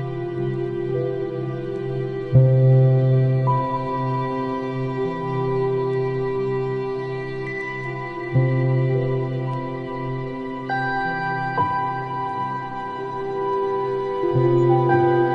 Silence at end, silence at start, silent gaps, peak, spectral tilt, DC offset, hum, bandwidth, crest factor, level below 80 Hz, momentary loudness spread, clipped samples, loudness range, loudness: 0 s; 0 s; none; -4 dBFS; -10 dB/octave; under 0.1%; none; 5 kHz; 18 dB; -50 dBFS; 11 LU; under 0.1%; 5 LU; -22 LUFS